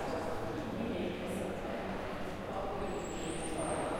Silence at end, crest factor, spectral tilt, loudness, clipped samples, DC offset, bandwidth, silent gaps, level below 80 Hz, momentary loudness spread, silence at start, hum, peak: 0 s; 14 dB; -5 dB/octave; -39 LUFS; under 0.1%; under 0.1%; 16.5 kHz; none; -52 dBFS; 3 LU; 0 s; none; -24 dBFS